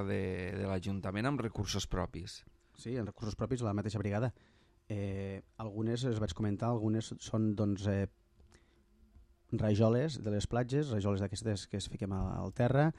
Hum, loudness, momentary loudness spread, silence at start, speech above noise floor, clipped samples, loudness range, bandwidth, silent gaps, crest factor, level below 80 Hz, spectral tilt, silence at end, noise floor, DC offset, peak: none; -36 LUFS; 9 LU; 0 s; 31 dB; under 0.1%; 4 LU; 11.5 kHz; none; 18 dB; -54 dBFS; -6.5 dB/octave; 0 s; -66 dBFS; under 0.1%; -16 dBFS